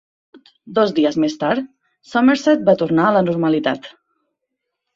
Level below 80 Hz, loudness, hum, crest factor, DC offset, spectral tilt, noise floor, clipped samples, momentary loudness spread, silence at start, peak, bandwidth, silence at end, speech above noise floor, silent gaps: -60 dBFS; -17 LUFS; none; 16 dB; under 0.1%; -6.5 dB/octave; -78 dBFS; under 0.1%; 9 LU; 0.65 s; -2 dBFS; 7.6 kHz; 1.05 s; 62 dB; none